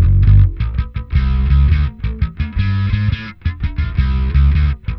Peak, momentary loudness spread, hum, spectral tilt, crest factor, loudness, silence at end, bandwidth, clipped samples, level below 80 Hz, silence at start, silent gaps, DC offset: 0 dBFS; 10 LU; none; -9.5 dB/octave; 14 dB; -16 LUFS; 0 s; 5.6 kHz; under 0.1%; -16 dBFS; 0 s; none; under 0.1%